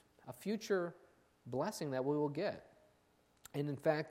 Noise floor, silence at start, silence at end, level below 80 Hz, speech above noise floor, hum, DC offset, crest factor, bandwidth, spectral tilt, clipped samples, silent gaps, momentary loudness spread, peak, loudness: -73 dBFS; 0.25 s; 0 s; -80 dBFS; 35 dB; none; under 0.1%; 22 dB; 16 kHz; -6 dB/octave; under 0.1%; none; 11 LU; -20 dBFS; -40 LUFS